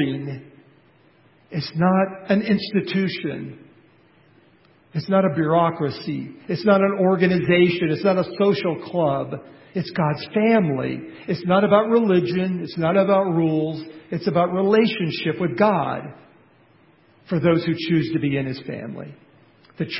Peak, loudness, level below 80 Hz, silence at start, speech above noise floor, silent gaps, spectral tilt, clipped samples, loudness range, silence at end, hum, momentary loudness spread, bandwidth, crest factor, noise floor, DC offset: -2 dBFS; -21 LUFS; -58 dBFS; 0 s; 35 dB; none; -11.5 dB/octave; under 0.1%; 5 LU; 0 s; none; 14 LU; 5.8 kHz; 20 dB; -56 dBFS; under 0.1%